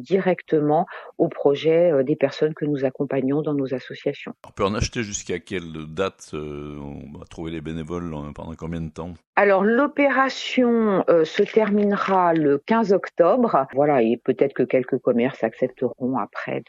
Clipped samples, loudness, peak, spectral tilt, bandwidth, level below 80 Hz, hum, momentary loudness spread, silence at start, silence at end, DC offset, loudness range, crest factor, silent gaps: under 0.1%; -21 LUFS; -4 dBFS; -6 dB/octave; 10 kHz; -48 dBFS; none; 15 LU; 0 s; 0.05 s; under 0.1%; 11 LU; 18 dB; 9.27-9.33 s